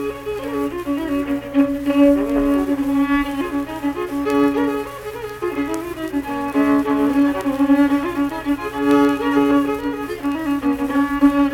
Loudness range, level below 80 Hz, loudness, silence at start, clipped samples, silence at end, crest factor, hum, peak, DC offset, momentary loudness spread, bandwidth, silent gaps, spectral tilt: 3 LU; -42 dBFS; -19 LUFS; 0 s; under 0.1%; 0 s; 16 dB; none; -2 dBFS; under 0.1%; 9 LU; 16 kHz; none; -6 dB/octave